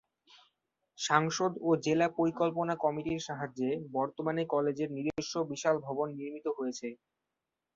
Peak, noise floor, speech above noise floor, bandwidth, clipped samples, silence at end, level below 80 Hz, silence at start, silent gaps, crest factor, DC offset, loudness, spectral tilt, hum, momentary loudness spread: -10 dBFS; -88 dBFS; 56 dB; 7.8 kHz; under 0.1%; 0.8 s; -70 dBFS; 1 s; none; 22 dB; under 0.1%; -32 LUFS; -5 dB/octave; none; 9 LU